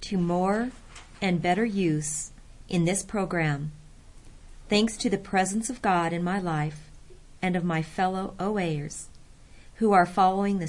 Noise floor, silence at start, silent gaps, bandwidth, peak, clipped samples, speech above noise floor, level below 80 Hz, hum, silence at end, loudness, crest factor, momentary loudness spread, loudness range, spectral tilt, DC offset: -49 dBFS; 0 s; none; 11.5 kHz; -8 dBFS; under 0.1%; 23 dB; -50 dBFS; none; 0 s; -27 LUFS; 20 dB; 11 LU; 3 LU; -5 dB/octave; under 0.1%